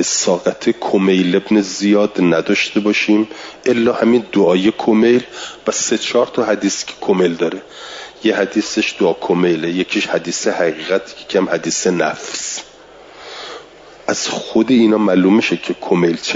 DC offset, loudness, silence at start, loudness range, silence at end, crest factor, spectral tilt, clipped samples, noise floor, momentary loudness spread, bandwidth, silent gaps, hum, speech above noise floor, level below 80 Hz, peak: under 0.1%; -16 LUFS; 0 s; 5 LU; 0 s; 14 dB; -4 dB/octave; under 0.1%; -40 dBFS; 11 LU; 7.8 kHz; none; none; 25 dB; -58 dBFS; -2 dBFS